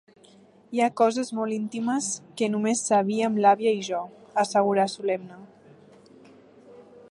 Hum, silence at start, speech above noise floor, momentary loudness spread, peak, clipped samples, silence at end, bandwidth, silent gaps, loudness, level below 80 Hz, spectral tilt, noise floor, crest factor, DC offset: none; 0.7 s; 30 dB; 10 LU; -6 dBFS; under 0.1%; 0.1 s; 11.5 kHz; none; -25 LUFS; -78 dBFS; -4.5 dB/octave; -55 dBFS; 20 dB; under 0.1%